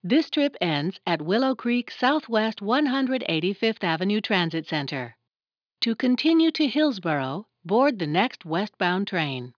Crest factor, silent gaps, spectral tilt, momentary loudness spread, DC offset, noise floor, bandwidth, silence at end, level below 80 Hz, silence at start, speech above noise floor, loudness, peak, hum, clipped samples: 18 dB; none; -6.5 dB/octave; 6 LU; under 0.1%; under -90 dBFS; 5.4 kHz; 0.05 s; -82 dBFS; 0.05 s; over 66 dB; -24 LUFS; -6 dBFS; none; under 0.1%